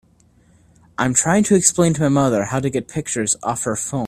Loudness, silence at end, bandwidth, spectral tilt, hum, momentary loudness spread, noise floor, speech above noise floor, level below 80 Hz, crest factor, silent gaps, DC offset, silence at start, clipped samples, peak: -18 LUFS; 0 s; 15 kHz; -4.5 dB/octave; none; 9 LU; -54 dBFS; 36 dB; -50 dBFS; 20 dB; none; under 0.1%; 1 s; under 0.1%; 0 dBFS